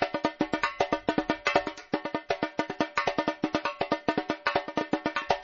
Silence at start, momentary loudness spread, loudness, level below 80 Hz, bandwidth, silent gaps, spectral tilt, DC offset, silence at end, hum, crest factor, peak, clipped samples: 0 s; 5 LU; -30 LUFS; -58 dBFS; 7.2 kHz; none; -2.5 dB/octave; under 0.1%; 0 s; none; 22 dB; -8 dBFS; under 0.1%